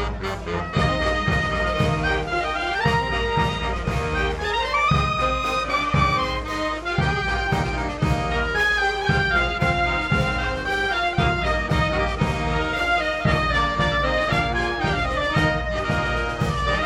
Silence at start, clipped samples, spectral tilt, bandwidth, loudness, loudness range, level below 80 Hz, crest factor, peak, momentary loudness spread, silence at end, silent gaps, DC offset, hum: 0 s; under 0.1%; -5.5 dB/octave; 13 kHz; -22 LUFS; 1 LU; -32 dBFS; 16 dB; -6 dBFS; 4 LU; 0 s; none; under 0.1%; none